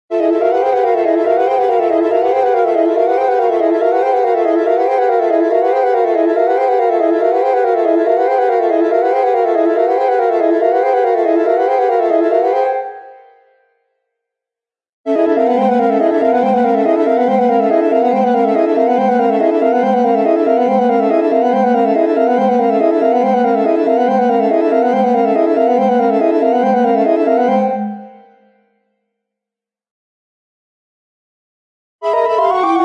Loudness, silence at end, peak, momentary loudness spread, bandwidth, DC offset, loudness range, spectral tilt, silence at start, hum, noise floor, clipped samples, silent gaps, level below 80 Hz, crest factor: -13 LUFS; 0 s; 0 dBFS; 1 LU; 7.4 kHz; under 0.1%; 5 LU; -7.5 dB/octave; 0.1 s; none; -88 dBFS; under 0.1%; 14.93-15.04 s, 29.91-31.99 s; -74 dBFS; 12 dB